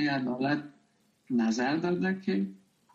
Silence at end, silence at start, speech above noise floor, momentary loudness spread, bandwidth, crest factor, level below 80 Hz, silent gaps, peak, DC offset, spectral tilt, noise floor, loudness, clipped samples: 0.4 s; 0 s; 39 dB; 6 LU; 7.8 kHz; 16 dB; -72 dBFS; none; -16 dBFS; under 0.1%; -6 dB/octave; -68 dBFS; -30 LUFS; under 0.1%